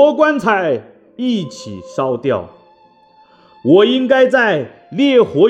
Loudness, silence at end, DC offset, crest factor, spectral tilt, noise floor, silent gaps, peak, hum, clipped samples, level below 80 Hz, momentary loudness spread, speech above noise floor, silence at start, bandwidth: -14 LUFS; 0 s; under 0.1%; 14 dB; -6 dB/octave; -49 dBFS; none; 0 dBFS; none; under 0.1%; -62 dBFS; 12 LU; 36 dB; 0 s; 9.6 kHz